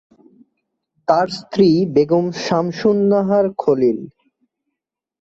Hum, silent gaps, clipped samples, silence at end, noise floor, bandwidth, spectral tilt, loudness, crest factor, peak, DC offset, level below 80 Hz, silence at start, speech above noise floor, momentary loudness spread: none; none; under 0.1%; 1.1 s; -83 dBFS; 7.8 kHz; -7 dB/octave; -17 LUFS; 16 dB; -2 dBFS; under 0.1%; -58 dBFS; 1.1 s; 67 dB; 5 LU